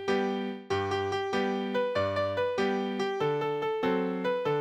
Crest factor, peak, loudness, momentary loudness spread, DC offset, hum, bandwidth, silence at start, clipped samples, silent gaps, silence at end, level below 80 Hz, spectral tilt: 14 dB; -16 dBFS; -30 LUFS; 2 LU; under 0.1%; none; 9.8 kHz; 0 s; under 0.1%; none; 0 s; -68 dBFS; -6 dB/octave